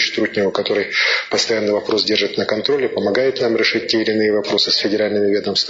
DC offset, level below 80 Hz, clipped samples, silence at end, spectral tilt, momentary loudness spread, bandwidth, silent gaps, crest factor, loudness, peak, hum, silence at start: under 0.1%; -60 dBFS; under 0.1%; 0 s; -3.5 dB/octave; 3 LU; 7.8 kHz; none; 16 dB; -17 LUFS; -2 dBFS; none; 0 s